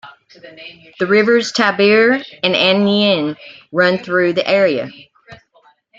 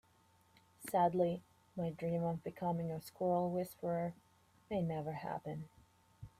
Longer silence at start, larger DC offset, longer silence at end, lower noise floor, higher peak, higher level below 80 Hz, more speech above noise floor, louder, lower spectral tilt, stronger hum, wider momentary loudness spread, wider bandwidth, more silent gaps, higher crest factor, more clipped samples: second, 0.05 s vs 0.8 s; neither; first, 0.65 s vs 0.1 s; second, -53 dBFS vs -70 dBFS; first, 0 dBFS vs -22 dBFS; first, -62 dBFS vs -72 dBFS; first, 38 dB vs 33 dB; first, -14 LUFS vs -39 LUFS; second, -5 dB/octave vs -7.5 dB/octave; neither; first, 20 LU vs 13 LU; second, 7.8 kHz vs 15.5 kHz; neither; about the same, 16 dB vs 18 dB; neither